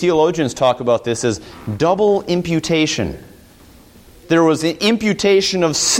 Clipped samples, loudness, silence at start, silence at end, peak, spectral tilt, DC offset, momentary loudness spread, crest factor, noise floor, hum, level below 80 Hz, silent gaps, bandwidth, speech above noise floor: under 0.1%; -16 LUFS; 0 s; 0 s; -2 dBFS; -4 dB/octave; under 0.1%; 8 LU; 14 dB; -44 dBFS; none; -46 dBFS; none; 16.5 kHz; 28 dB